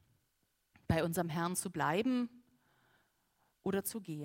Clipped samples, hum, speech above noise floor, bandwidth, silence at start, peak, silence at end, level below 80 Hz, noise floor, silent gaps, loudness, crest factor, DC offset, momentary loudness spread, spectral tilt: under 0.1%; none; 44 dB; 16 kHz; 0.9 s; -18 dBFS; 0 s; -64 dBFS; -80 dBFS; none; -36 LUFS; 20 dB; under 0.1%; 7 LU; -5 dB/octave